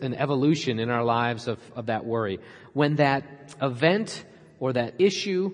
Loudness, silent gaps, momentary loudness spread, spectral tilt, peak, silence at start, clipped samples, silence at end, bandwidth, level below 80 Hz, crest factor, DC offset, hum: -26 LUFS; none; 11 LU; -6 dB/octave; -6 dBFS; 0 s; under 0.1%; 0 s; 10.5 kHz; -68 dBFS; 20 dB; under 0.1%; none